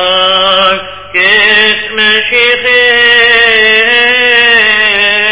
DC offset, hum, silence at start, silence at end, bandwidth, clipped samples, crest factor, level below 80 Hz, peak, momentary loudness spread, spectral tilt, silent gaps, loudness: 1%; none; 0 s; 0 s; 4 kHz; 3%; 8 dB; -42 dBFS; 0 dBFS; 4 LU; -4.5 dB/octave; none; -5 LUFS